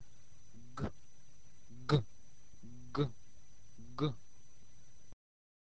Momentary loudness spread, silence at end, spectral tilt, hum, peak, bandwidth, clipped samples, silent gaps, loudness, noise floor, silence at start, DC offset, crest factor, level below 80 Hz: 28 LU; 1.6 s; -7 dB/octave; none; -20 dBFS; 8 kHz; under 0.1%; none; -39 LUFS; -65 dBFS; 0.55 s; 0.7%; 24 dB; -62 dBFS